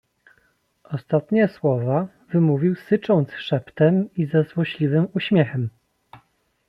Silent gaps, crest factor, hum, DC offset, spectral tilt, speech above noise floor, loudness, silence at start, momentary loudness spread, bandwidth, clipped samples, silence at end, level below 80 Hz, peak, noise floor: none; 18 dB; none; under 0.1%; -9.5 dB/octave; 44 dB; -21 LUFS; 0.9 s; 7 LU; 5.4 kHz; under 0.1%; 0.55 s; -64 dBFS; -4 dBFS; -64 dBFS